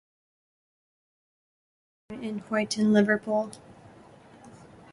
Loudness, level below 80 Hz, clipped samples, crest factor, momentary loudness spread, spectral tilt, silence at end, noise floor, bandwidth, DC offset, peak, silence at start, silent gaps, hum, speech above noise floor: -26 LUFS; -68 dBFS; under 0.1%; 22 dB; 18 LU; -5.5 dB/octave; 0.3 s; -52 dBFS; 11.5 kHz; under 0.1%; -8 dBFS; 2.1 s; none; none; 27 dB